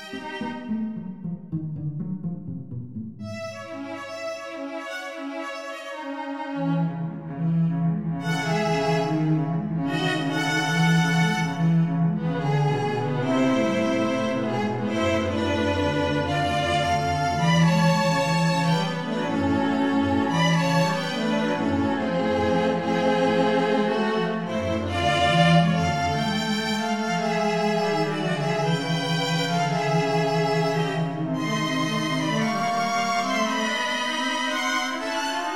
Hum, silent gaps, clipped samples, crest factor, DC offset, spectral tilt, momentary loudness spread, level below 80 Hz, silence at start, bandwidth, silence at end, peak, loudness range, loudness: none; none; under 0.1%; 18 dB; 0.3%; -5.5 dB/octave; 11 LU; -54 dBFS; 0 s; 13 kHz; 0 s; -6 dBFS; 10 LU; -24 LUFS